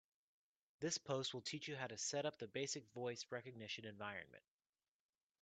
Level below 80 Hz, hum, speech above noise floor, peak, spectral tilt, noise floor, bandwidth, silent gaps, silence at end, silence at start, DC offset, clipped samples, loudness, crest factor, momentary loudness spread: -88 dBFS; none; over 43 dB; -28 dBFS; -3 dB/octave; under -90 dBFS; 9 kHz; none; 1.05 s; 0.8 s; under 0.1%; under 0.1%; -47 LUFS; 22 dB; 8 LU